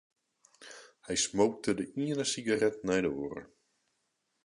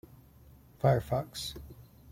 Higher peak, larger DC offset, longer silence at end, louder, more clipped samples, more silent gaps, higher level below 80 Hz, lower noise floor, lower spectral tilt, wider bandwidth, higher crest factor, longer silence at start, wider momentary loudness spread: about the same, -14 dBFS vs -14 dBFS; neither; first, 1 s vs 0 s; about the same, -31 LUFS vs -32 LUFS; neither; neither; second, -66 dBFS vs -54 dBFS; first, -80 dBFS vs -57 dBFS; second, -3.5 dB/octave vs -6 dB/octave; second, 11.5 kHz vs 16.5 kHz; about the same, 20 dB vs 20 dB; second, 0.6 s vs 0.85 s; about the same, 21 LU vs 20 LU